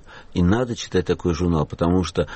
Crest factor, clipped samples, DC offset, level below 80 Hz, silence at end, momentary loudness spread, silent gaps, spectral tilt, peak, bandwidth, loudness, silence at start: 14 dB; under 0.1%; under 0.1%; -38 dBFS; 0 s; 3 LU; none; -6.5 dB/octave; -8 dBFS; 8.4 kHz; -22 LUFS; 0.1 s